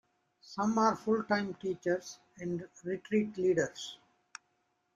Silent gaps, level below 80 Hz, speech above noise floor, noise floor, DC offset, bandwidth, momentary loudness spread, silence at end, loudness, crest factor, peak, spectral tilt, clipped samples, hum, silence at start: none; -72 dBFS; 45 dB; -78 dBFS; under 0.1%; 8.8 kHz; 20 LU; 1 s; -33 LUFS; 20 dB; -16 dBFS; -5.5 dB/octave; under 0.1%; none; 0.45 s